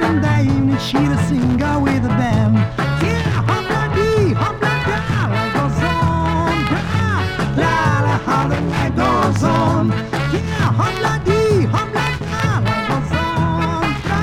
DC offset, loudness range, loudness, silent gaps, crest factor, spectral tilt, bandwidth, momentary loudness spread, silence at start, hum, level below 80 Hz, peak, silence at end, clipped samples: under 0.1%; 1 LU; -17 LUFS; none; 14 dB; -6.5 dB/octave; 14 kHz; 4 LU; 0 s; none; -32 dBFS; -2 dBFS; 0 s; under 0.1%